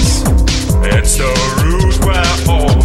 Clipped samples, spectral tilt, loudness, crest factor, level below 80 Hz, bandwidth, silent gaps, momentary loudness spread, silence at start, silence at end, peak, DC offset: under 0.1%; -4.5 dB/octave; -12 LUFS; 10 dB; -14 dBFS; 13 kHz; none; 2 LU; 0 s; 0 s; 0 dBFS; under 0.1%